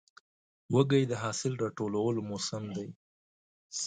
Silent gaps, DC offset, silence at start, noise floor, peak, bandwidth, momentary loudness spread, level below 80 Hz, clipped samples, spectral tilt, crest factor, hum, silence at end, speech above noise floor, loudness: 2.96-3.70 s; under 0.1%; 0.7 s; under -90 dBFS; -12 dBFS; 9.6 kHz; 14 LU; -68 dBFS; under 0.1%; -5.5 dB/octave; 20 dB; none; 0 s; over 59 dB; -32 LUFS